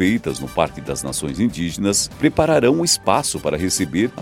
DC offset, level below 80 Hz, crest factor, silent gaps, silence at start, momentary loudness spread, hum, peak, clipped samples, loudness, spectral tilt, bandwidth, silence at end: under 0.1%; -42 dBFS; 18 dB; none; 0 s; 8 LU; none; 0 dBFS; under 0.1%; -19 LUFS; -4 dB/octave; 16.5 kHz; 0 s